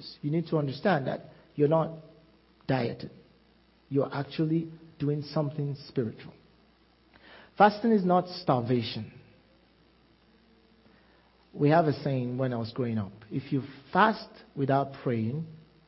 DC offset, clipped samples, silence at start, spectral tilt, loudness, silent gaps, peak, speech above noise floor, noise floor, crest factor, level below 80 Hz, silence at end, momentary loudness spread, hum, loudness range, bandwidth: under 0.1%; under 0.1%; 0 s; -10.5 dB/octave; -29 LUFS; none; -8 dBFS; 35 dB; -63 dBFS; 22 dB; -66 dBFS; 0.3 s; 16 LU; none; 5 LU; 5.8 kHz